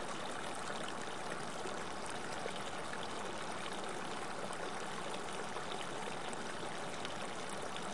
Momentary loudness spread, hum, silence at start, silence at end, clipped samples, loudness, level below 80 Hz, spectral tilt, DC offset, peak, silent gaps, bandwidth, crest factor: 1 LU; none; 0 s; 0 s; under 0.1%; -43 LUFS; -72 dBFS; -3 dB/octave; 0.5%; -24 dBFS; none; 11.5 kHz; 18 dB